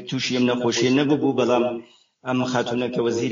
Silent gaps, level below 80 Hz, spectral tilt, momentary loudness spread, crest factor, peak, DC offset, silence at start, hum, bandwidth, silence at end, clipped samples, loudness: none; -64 dBFS; -5 dB/octave; 7 LU; 16 dB; -6 dBFS; under 0.1%; 0 s; none; 7.6 kHz; 0 s; under 0.1%; -22 LUFS